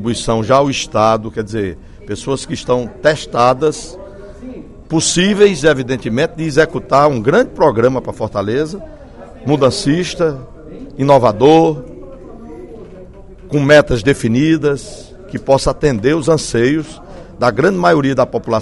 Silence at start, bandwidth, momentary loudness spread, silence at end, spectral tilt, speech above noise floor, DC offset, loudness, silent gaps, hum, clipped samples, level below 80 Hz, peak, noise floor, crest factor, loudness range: 0 s; 12 kHz; 23 LU; 0 s; -5 dB/octave; 22 dB; under 0.1%; -14 LUFS; none; none; 0.1%; -36 dBFS; 0 dBFS; -35 dBFS; 14 dB; 3 LU